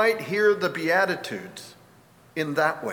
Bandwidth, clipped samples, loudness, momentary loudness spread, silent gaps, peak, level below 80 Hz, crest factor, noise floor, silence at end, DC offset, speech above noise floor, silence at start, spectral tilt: 19.5 kHz; under 0.1%; -24 LUFS; 14 LU; none; -8 dBFS; -70 dBFS; 18 dB; -54 dBFS; 0 s; under 0.1%; 30 dB; 0 s; -4.5 dB/octave